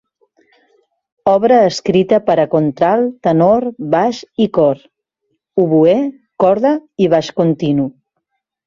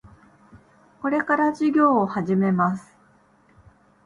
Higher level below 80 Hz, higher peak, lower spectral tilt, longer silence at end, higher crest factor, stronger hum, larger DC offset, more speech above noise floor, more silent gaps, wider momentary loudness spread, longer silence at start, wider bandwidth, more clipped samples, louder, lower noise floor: first, -54 dBFS vs -62 dBFS; first, 0 dBFS vs -8 dBFS; second, -7 dB/octave vs -8.5 dB/octave; second, 0.75 s vs 1.25 s; about the same, 14 dB vs 16 dB; neither; neither; first, 59 dB vs 37 dB; neither; about the same, 7 LU vs 7 LU; first, 1.25 s vs 0.55 s; second, 7.6 kHz vs 10.5 kHz; neither; first, -14 LUFS vs -21 LUFS; first, -72 dBFS vs -58 dBFS